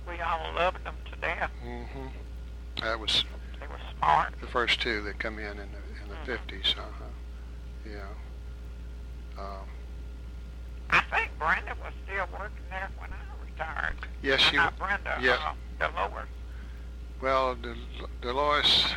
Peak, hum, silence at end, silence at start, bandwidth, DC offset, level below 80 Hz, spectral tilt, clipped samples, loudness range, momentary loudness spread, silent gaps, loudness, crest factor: -10 dBFS; none; 0 s; 0 s; 13.5 kHz; under 0.1%; -40 dBFS; -3.5 dB/octave; under 0.1%; 8 LU; 18 LU; none; -29 LUFS; 20 dB